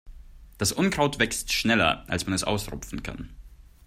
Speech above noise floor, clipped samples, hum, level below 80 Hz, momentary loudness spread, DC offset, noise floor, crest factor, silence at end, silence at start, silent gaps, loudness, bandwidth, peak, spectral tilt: 20 dB; under 0.1%; none; -44 dBFS; 14 LU; under 0.1%; -46 dBFS; 22 dB; 0.25 s; 0.05 s; none; -25 LUFS; 16 kHz; -6 dBFS; -3.5 dB/octave